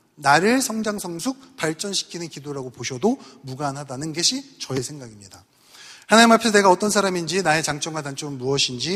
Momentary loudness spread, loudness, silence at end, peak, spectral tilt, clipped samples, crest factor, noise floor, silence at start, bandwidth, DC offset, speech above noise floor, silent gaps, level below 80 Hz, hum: 17 LU; -21 LUFS; 0 s; 0 dBFS; -3 dB/octave; under 0.1%; 22 dB; -46 dBFS; 0.2 s; 15.5 kHz; under 0.1%; 24 dB; none; -60 dBFS; none